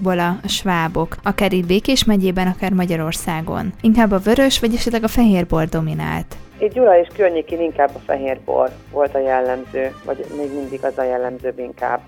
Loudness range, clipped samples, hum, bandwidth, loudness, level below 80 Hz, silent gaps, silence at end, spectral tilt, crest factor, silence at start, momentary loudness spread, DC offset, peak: 4 LU; under 0.1%; none; 19.5 kHz; -18 LUFS; -34 dBFS; none; 0.05 s; -5.5 dB/octave; 16 dB; 0 s; 10 LU; under 0.1%; -2 dBFS